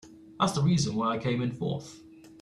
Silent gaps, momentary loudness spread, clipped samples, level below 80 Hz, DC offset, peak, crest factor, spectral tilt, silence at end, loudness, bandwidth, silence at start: none; 10 LU; under 0.1%; -58 dBFS; under 0.1%; -12 dBFS; 16 dB; -6 dB/octave; 0.05 s; -29 LUFS; 12.5 kHz; 0.05 s